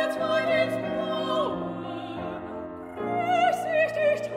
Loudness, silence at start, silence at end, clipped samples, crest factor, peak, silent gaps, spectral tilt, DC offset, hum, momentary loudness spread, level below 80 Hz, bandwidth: -27 LUFS; 0 s; 0 s; under 0.1%; 16 dB; -12 dBFS; none; -5.5 dB/octave; under 0.1%; none; 12 LU; -60 dBFS; 15.5 kHz